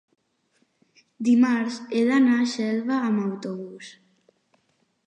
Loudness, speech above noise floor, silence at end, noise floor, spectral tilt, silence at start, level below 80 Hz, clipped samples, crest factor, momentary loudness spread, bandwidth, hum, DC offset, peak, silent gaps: -23 LUFS; 47 dB; 1.15 s; -69 dBFS; -5.5 dB/octave; 1.2 s; -78 dBFS; under 0.1%; 14 dB; 17 LU; 9.6 kHz; none; under 0.1%; -10 dBFS; none